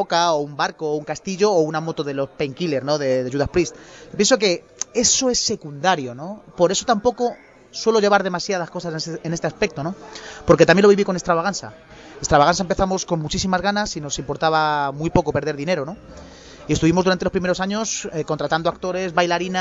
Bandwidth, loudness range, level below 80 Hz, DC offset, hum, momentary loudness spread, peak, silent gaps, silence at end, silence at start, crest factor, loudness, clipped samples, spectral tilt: 8 kHz; 4 LU; -44 dBFS; under 0.1%; none; 11 LU; -2 dBFS; none; 0 s; 0 s; 18 dB; -20 LUFS; under 0.1%; -4 dB/octave